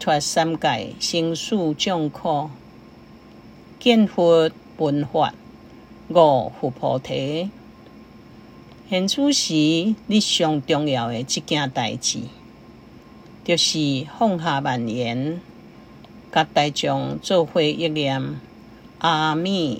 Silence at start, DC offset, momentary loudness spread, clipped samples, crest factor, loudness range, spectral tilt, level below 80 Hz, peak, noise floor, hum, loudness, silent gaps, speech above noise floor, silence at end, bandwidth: 0 s; under 0.1%; 9 LU; under 0.1%; 22 dB; 3 LU; -4.5 dB/octave; -58 dBFS; 0 dBFS; -45 dBFS; none; -21 LUFS; none; 24 dB; 0 s; 16 kHz